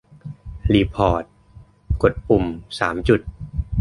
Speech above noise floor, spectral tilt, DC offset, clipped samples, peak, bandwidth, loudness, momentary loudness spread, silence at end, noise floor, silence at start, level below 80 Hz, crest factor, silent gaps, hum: 28 dB; -7.5 dB/octave; under 0.1%; under 0.1%; -2 dBFS; 11.5 kHz; -21 LUFS; 18 LU; 0 s; -47 dBFS; 0.25 s; -32 dBFS; 20 dB; none; none